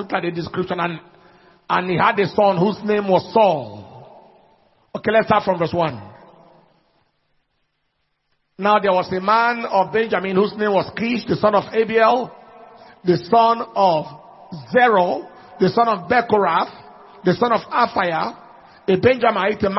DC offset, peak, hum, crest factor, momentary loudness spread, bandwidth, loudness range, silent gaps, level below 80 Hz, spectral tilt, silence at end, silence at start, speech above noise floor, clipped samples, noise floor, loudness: under 0.1%; -2 dBFS; none; 18 dB; 10 LU; 6 kHz; 5 LU; none; -58 dBFS; -8 dB/octave; 0 s; 0 s; 53 dB; under 0.1%; -70 dBFS; -18 LUFS